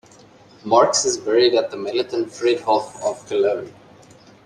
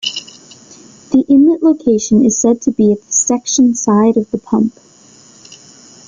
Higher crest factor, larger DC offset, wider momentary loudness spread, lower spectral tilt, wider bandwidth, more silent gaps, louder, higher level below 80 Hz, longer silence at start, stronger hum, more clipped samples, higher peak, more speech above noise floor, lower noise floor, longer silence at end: first, 18 dB vs 12 dB; neither; first, 11 LU vs 7 LU; second, -2.5 dB/octave vs -4.5 dB/octave; first, 11 kHz vs 9.6 kHz; neither; second, -19 LUFS vs -12 LUFS; second, -66 dBFS vs -52 dBFS; first, 0.65 s vs 0.05 s; neither; neither; about the same, -2 dBFS vs -2 dBFS; about the same, 29 dB vs 32 dB; first, -48 dBFS vs -43 dBFS; first, 0.75 s vs 0.55 s